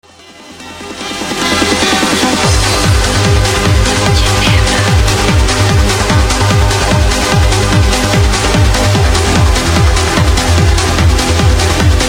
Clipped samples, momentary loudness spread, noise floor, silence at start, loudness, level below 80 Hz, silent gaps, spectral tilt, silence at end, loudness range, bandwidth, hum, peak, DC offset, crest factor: under 0.1%; 1 LU; -35 dBFS; 0.4 s; -10 LUFS; -16 dBFS; none; -4 dB/octave; 0 s; 1 LU; 16.5 kHz; none; 0 dBFS; 0.3%; 10 dB